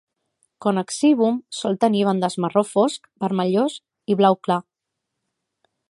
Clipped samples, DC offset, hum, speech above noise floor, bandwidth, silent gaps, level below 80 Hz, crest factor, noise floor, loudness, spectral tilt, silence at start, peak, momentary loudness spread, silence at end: under 0.1%; under 0.1%; none; 62 dB; 11.5 kHz; none; -72 dBFS; 18 dB; -81 dBFS; -21 LUFS; -6 dB/octave; 0.6 s; -2 dBFS; 8 LU; 1.3 s